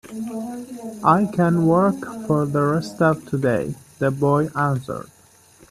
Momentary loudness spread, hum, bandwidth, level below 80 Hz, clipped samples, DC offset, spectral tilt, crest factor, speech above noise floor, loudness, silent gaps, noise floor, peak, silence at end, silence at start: 14 LU; none; 14 kHz; -56 dBFS; under 0.1%; under 0.1%; -8 dB/octave; 20 dB; 31 dB; -21 LUFS; none; -51 dBFS; -2 dBFS; 0.65 s; 0.05 s